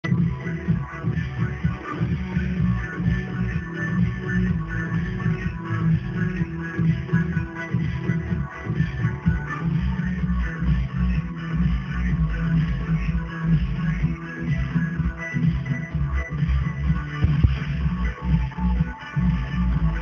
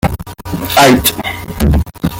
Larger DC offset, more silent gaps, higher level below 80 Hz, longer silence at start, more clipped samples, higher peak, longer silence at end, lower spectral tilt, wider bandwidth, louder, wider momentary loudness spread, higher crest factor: neither; neither; second, -30 dBFS vs -22 dBFS; about the same, 0.05 s vs 0.05 s; neither; second, -4 dBFS vs 0 dBFS; about the same, 0 s vs 0 s; first, -8.5 dB/octave vs -4.5 dB/octave; second, 6.6 kHz vs 17.5 kHz; second, -25 LUFS vs -12 LUFS; second, 4 LU vs 14 LU; first, 20 dB vs 12 dB